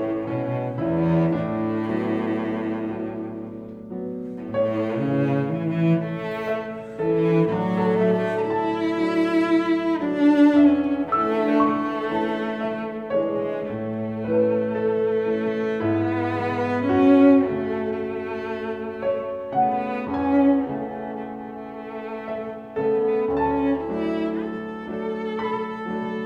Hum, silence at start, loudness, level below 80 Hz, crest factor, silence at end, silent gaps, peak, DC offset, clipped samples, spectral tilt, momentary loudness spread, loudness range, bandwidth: none; 0 s; -23 LUFS; -54 dBFS; 18 dB; 0 s; none; -6 dBFS; under 0.1%; under 0.1%; -9 dB/octave; 12 LU; 6 LU; 6.8 kHz